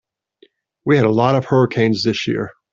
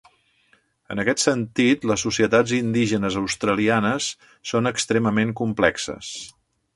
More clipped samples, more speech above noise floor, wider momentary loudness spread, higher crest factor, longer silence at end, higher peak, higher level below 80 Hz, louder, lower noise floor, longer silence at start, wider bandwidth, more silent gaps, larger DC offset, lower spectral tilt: neither; about the same, 39 dB vs 41 dB; second, 8 LU vs 11 LU; second, 16 dB vs 22 dB; second, 0.2 s vs 0.45 s; about the same, -2 dBFS vs -2 dBFS; about the same, -54 dBFS vs -54 dBFS; first, -17 LUFS vs -21 LUFS; second, -55 dBFS vs -62 dBFS; about the same, 0.85 s vs 0.9 s; second, 7.6 kHz vs 11.5 kHz; neither; neither; first, -7 dB/octave vs -4.5 dB/octave